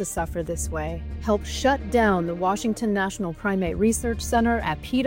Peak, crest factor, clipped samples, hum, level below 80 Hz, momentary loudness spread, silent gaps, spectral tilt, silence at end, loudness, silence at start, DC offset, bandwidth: -10 dBFS; 14 dB; under 0.1%; none; -36 dBFS; 7 LU; none; -5 dB/octave; 0 s; -24 LUFS; 0 s; under 0.1%; 16.5 kHz